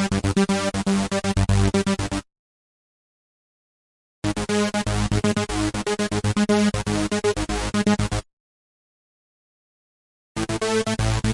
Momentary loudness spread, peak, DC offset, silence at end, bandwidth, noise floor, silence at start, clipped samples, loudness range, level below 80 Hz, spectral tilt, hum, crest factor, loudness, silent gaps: 7 LU; -8 dBFS; under 0.1%; 0 s; 11.5 kHz; under -90 dBFS; 0 s; under 0.1%; 6 LU; -36 dBFS; -5 dB/octave; none; 16 dB; -23 LUFS; 2.39-4.22 s, 8.33-10.35 s